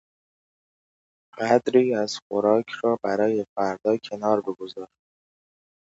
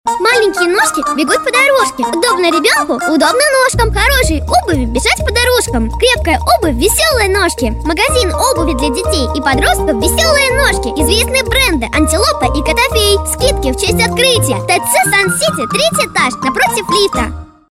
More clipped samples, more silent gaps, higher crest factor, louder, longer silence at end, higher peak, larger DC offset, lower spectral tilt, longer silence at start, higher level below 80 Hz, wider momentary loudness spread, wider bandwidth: neither; first, 2.22-2.30 s, 3.49-3.56 s vs none; first, 22 dB vs 12 dB; second, -24 LUFS vs -11 LUFS; first, 1.1 s vs 0.3 s; second, -4 dBFS vs 0 dBFS; neither; first, -5.5 dB/octave vs -3.5 dB/octave; first, 1.35 s vs 0.05 s; second, -70 dBFS vs -22 dBFS; first, 13 LU vs 4 LU; second, 8 kHz vs 16.5 kHz